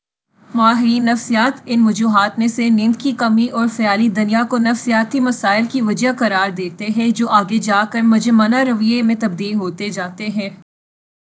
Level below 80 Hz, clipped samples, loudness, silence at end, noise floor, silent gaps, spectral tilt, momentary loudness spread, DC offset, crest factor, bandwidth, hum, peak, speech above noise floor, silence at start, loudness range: -66 dBFS; under 0.1%; -16 LUFS; 0.7 s; -52 dBFS; none; -5 dB/octave; 9 LU; under 0.1%; 16 dB; 8 kHz; none; 0 dBFS; 37 dB; 0.55 s; 1 LU